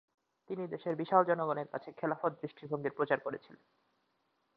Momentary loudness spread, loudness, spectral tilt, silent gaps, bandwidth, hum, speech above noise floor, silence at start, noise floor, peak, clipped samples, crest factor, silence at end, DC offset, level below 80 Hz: 14 LU; -35 LUFS; -5.5 dB/octave; none; 5.2 kHz; none; 44 dB; 0.5 s; -79 dBFS; -12 dBFS; under 0.1%; 24 dB; 1 s; under 0.1%; -84 dBFS